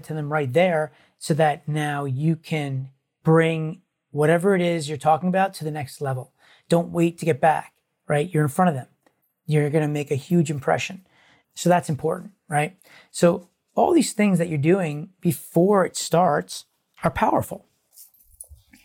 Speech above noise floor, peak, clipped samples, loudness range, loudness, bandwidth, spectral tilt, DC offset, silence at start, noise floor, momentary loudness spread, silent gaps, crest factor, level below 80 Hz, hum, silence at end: 45 dB; -6 dBFS; under 0.1%; 3 LU; -22 LUFS; 17 kHz; -6 dB/octave; under 0.1%; 0.05 s; -66 dBFS; 13 LU; none; 16 dB; -58 dBFS; none; 0.3 s